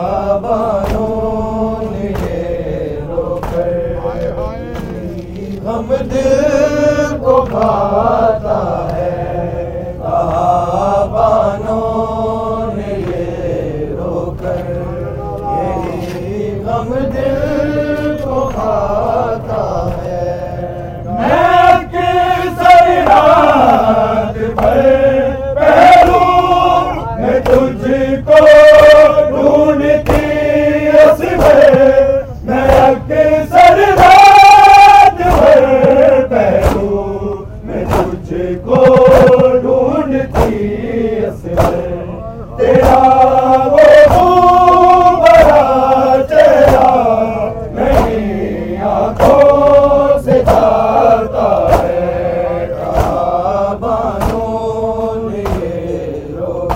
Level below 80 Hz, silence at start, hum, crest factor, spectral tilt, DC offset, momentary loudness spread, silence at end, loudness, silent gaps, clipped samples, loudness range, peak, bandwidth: -26 dBFS; 0 s; none; 10 dB; -6.5 dB/octave; under 0.1%; 14 LU; 0 s; -10 LUFS; none; 0.7%; 11 LU; 0 dBFS; 16.5 kHz